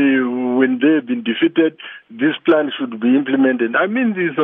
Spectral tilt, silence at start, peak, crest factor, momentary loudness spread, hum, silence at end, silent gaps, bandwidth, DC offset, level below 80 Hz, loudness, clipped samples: -9 dB/octave; 0 s; -2 dBFS; 14 dB; 5 LU; none; 0 s; none; 3.8 kHz; under 0.1%; -72 dBFS; -17 LUFS; under 0.1%